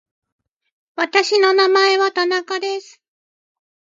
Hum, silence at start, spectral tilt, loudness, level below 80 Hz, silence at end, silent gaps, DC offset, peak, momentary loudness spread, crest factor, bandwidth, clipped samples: none; 0.95 s; 0 dB/octave; -16 LUFS; -78 dBFS; 1.15 s; none; under 0.1%; -2 dBFS; 12 LU; 18 dB; 7.8 kHz; under 0.1%